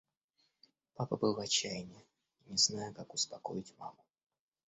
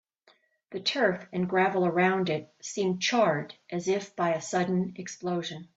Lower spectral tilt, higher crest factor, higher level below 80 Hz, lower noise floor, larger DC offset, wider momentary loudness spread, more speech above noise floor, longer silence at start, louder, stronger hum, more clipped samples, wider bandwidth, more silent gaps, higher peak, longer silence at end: second, -3 dB/octave vs -4.5 dB/octave; first, 24 dB vs 18 dB; about the same, -74 dBFS vs -72 dBFS; first, -79 dBFS vs -65 dBFS; neither; first, 20 LU vs 9 LU; first, 42 dB vs 37 dB; first, 1 s vs 0.7 s; second, -35 LUFS vs -28 LUFS; neither; neither; about the same, 8 kHz vs 8 kHz; neither; second, -16 dBFS vs -12 dBFS; first, 0.8 s vs 0.1 s